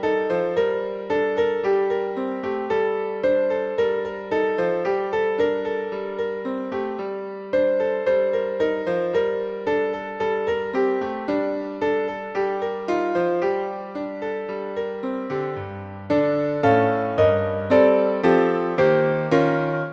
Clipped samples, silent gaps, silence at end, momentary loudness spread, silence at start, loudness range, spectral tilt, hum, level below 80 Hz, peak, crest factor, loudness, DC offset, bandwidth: under 0.1%; none; 0 s; 10 LU; 0 s; 6 LU; -7.5 dB/octave; none; -58 dBFS; -4 dBFS; 18 dB; -23 LUFS; under 0.1%; 7.2 kHz